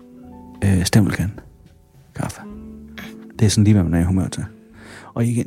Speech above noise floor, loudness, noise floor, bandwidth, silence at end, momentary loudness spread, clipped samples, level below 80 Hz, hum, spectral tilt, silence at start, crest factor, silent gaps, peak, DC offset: 32 dB; -19 LUFS; -49 dBFS; 14.5 kHz; 0 s; 24 LU; under 0.1%; -40 dBFS; none; -6 dB/octave; 0.15 s; 18 dB; none; -2 dBFS; under 0.1%